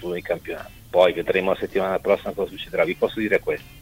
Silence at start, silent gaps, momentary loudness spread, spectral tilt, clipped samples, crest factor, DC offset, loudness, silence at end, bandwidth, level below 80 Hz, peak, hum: 0 s; none; 10 LU; -5.5 dB/octave; under 0.1%; 20 dB; under 0.1%; -23 LUFS; 0 s; 16 kHz; -50 dBFS; -4 dBFS; none